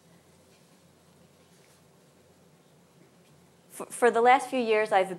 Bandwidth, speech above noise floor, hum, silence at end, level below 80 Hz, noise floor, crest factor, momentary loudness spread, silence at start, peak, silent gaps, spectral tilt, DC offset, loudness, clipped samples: 14 kHz; 36 dB; none; 0 s; -84 dBFS; -60 dBFS; 22 dB; 21 LU; 3.75 s; -8 dBFS; none; -3.5 dB/octave; under 0.1%; -24 LUFS; under 0.1%